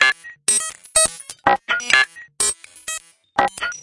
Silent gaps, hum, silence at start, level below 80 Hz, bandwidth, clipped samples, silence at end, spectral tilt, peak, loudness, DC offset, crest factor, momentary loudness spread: none; none; 0 s; -52 dBFS; 11.5 kHz; under 0.1%; 0 s; 0.5 dB/octave; 0 dBFS; -19 LUFS; under 0.1%; 20 dB; 13 LU